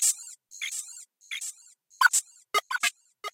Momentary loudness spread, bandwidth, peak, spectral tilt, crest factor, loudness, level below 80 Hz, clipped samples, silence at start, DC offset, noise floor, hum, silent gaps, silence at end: 19 LU; 16.5 kHz; -8 dBFS; 4.5 dB/octave; 22 dB; -28 LUFS; under -90 dBFS; under 0.1%; 0 s; under 0.1%; -57 dBFS; none; none; 0.05 s